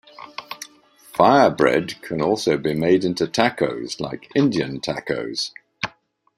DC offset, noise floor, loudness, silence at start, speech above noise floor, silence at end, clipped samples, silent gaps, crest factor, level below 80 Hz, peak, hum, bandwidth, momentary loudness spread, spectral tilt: under 0.1%; -55 dBFS; -21 LUFS; 0.2 s; 35 dB; 0.5 s; under 0.1%; none; 20 dB; -58 dBFS; -2 dBFS; none; 15.5 kHz; 18 LU; -5 dB/octave